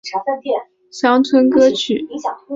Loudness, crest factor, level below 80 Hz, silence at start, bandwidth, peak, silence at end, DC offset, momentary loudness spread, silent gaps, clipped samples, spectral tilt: -16 LUFS; 14 dB; -60 dBFS; 0.05 s; 7.8 kHz; -2 dBFS; 0 s; under 0.1%; 12 LU; none; under 0.1%; -4 dB/octave